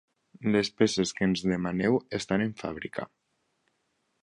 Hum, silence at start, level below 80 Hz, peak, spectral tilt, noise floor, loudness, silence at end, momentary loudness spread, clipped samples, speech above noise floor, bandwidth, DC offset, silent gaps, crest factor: none; 0.4 s; -58 dBFS; -10 dBFS; -5 dB/octave; -76 dBFS; -28 LUFS; 1.15 s; 11 LU; under 0.1%; 48 dB; 11 kHz; under 0.1%; none; 20 dB